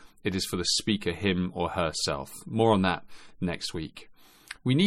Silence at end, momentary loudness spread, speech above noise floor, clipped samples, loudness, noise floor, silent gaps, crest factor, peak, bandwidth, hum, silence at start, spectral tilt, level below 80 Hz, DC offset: 0 s; 11 LU; 19 dB; under 0.1%; -28 LUFS; -48 dBFS; none; 20 dB; -10 dBFS; 16 kHz; none; 0 s; -4.5 dB/octave; -54 dBFS; under 0.1%